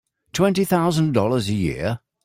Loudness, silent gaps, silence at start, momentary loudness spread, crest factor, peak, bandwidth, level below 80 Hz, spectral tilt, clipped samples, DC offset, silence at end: -21 LUFS; none; 0.35 s; 8 LU; 16 dB; -4 dBFS; 16 kHz; -48 dBFS; -6 dB/octave; under 0.1%; under 0.1%; 0.3 s